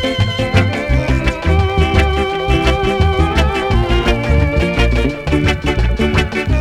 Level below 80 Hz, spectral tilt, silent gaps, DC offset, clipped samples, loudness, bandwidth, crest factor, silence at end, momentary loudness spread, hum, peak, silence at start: -18 dBFS; -6.5 dB/octave; none; under 0.1%; under 0.1%; -15 LUFS; 12 kHz; 14 dB; 0 s; 3 LU; none; 0 dBFS; 0 s